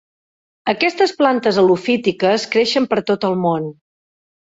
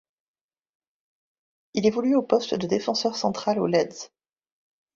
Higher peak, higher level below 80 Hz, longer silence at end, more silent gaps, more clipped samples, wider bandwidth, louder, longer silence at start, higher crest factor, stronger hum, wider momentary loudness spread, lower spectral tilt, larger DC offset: first, -2 dBFS vs -6 dBFS; first, -60 dBFS vs -66 dBFS; about the same, 0.8 s vs 0.9 s; neither; neither; about the same, 8 kHz vs 7.6 kHz; first, -17 LUFS vs -24 LUFS; second, 0.65 s vs 1.75 s; about the same, 16 dB vs 20 dB; neither; second, 7 LU vs 10 LU; about the same, -5 dB/octave vs -5 dB/octave; neither